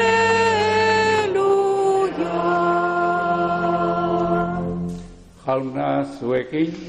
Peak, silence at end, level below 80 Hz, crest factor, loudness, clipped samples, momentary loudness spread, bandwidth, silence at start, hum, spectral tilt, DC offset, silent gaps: -8 dBFS; 0 s; -48 dBFS; 12 dB; -20 LUFS; under 0.1%; 8 LU; 11.5 kHz; 0 s; none; -5.5 dB/octave; under 0.1%; none